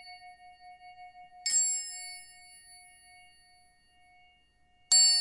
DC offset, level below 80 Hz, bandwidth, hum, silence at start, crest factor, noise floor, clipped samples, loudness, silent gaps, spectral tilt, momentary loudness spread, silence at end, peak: under 0.1%; -74 dBFS; 11.5 kHz; none; 0.05 s; 22 dB; -66 dBFS; under 0.1%; -26 LUFS; none; 5 dB/octave; 30 LU; 0 s; -12 dBFS